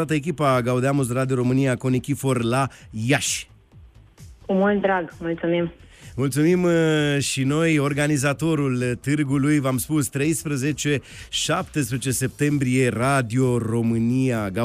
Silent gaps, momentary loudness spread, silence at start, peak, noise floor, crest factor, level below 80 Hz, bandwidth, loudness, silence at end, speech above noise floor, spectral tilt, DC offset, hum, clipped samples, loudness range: none; 6 LU; 0 s; -8 dBFS; -48 dBFS; 14 dB; -50 dBFS; 15.5 kHz; -22 LUFS; 0 s; 27 dB; -5.5 dB/octave; under 0.1%; none; under 0.1%; 3 LU